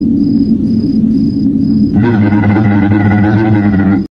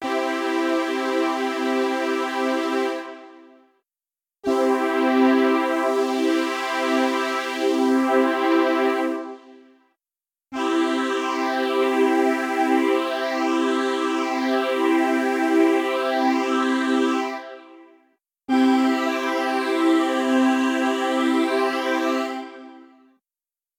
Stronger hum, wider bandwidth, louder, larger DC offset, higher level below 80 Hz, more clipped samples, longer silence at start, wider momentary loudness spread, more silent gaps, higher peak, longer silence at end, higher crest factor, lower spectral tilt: neither; second, 5.4 kHz vs 17 kHz; first, -10 LUFS vs -21 LUFS; neither; first, -32 dBFS vs -78 dBFS; neither; about the same, 0 s vs 0 s; second, 2 LU vs 6 LU; neither; first, 0 dBFS vs -6 dBFS; second, 0.1 s vs 0.95 s; second, 8 dB vs 14 dB; first, -10 dB/octave vs -2.5 dB/octave